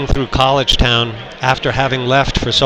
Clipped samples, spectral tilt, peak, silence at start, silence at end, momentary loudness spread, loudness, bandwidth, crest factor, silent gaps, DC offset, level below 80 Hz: 0.2%; -4.5 dB/octave; 0 dBFS; 0 s; 0 s; 6 LU; -14 LUFS; 13.5 kHz; 14 dB; none; under 0.1%; -24 dBFS